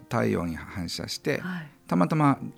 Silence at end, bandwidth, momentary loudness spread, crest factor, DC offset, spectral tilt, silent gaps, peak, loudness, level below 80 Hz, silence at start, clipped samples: 0.05 s; 16 kHz; 12 LU; 18 dB; under 0.1%; -6 dB/octave; none; -10 dBFS; -27 LUFS; -56 dBFS; 0 s; under 0.1%